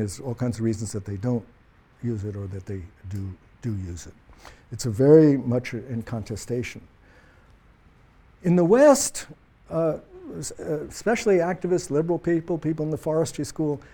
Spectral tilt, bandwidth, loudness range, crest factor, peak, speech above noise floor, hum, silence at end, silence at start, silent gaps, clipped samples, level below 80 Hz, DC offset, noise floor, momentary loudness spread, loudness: -6 dB/octave; 18.5 kHz; 10 LU; 20 dB; -4 dBFS; 31 dB; none; 0.1 s; 0 s; none; under 0.1%; -52 dBFS; under 0.1%; -55 dBFS; 19 LU; -24 LUFS